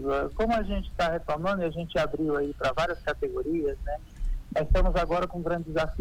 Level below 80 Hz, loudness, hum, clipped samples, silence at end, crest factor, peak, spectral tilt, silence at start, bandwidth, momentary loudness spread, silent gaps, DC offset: -34 dBFS; -29 LUFS; none; under 0.1%; 0 s; 16 dB; -12 dBFS; -6.5 dB/octave; 0 s; 10.5 kHz; 6 LU; none; under 0.1%